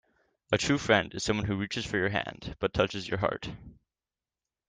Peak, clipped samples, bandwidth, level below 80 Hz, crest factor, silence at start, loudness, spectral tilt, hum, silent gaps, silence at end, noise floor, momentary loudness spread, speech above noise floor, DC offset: -10 dBFS; under 0.1%; 10 kHz; -52 dBFS; 22 dB; 0.5 s; -30 LUFS; -4.5 dB/octave; none; none; 0.95 s; under -90 dBFS; 12 LU; over 60 dB; under 0.1%